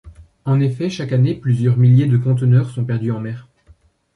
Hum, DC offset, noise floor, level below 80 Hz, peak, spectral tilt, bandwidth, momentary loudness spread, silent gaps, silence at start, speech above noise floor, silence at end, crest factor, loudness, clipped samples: none; under 0.1%; -51 dBFS; -50 dBFS; -4 dBFS; -9 dB/octave; 6.6 kHz; 12 LU; none; 0.05 s; 36 dB; 0.75 s; 12 dB; -17 LUFS; under 0.1%